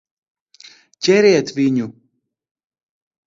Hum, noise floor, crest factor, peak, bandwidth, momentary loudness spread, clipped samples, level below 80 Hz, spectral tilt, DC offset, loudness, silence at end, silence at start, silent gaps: none; -68 dBFS; 18 dB; -2 dBFS; 7.6 kHz; 10 LU; under 0.1%; -64 dBFS; -5 dB/octave; under 0.1%; -16 LUFS; 1.35 s; 1 s; none